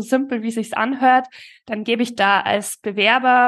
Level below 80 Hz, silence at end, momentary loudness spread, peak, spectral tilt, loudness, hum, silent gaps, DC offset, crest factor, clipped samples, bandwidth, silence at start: -72 dBFS; 0 s; 10 LU; -2 dBFS; -3.5 dB/octave; -18 LUFS; none; none; under 0.1%; 16 dB; under 0.1%; 12.5 kHz; 0 s